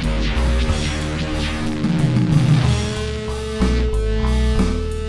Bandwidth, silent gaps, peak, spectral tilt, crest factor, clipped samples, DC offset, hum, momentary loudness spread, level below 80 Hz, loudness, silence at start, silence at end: 12 kHz; none; -2 dBFS; -6.5 dB/octave; 16 dB; under 0.1%; under 0.1%; none; 7 LU; -22 dBFS; -20 LUFS; 0 s; 0 s